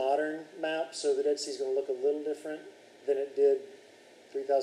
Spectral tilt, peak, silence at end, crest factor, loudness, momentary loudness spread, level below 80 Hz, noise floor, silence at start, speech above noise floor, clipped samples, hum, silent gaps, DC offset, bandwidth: -2.5 dB/octave; -16 dBFS; 0 s; 16 dB; -32 LUFS; 14 LU; under -90 dBFS; -56 dBFS; 0 s; 26 dB; under 0.1%; none; none; under 0.1%; 11.5 kHz